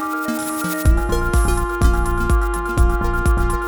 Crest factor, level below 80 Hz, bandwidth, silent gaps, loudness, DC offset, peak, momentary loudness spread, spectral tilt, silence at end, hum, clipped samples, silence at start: 14 dB; -18 dBFS; over 20 kHz; none; -19 LUFS; under 0.1%; -2 dBFS; 4 LU; -6 dB/octave; 0 s; none; under 0.1%; 0 s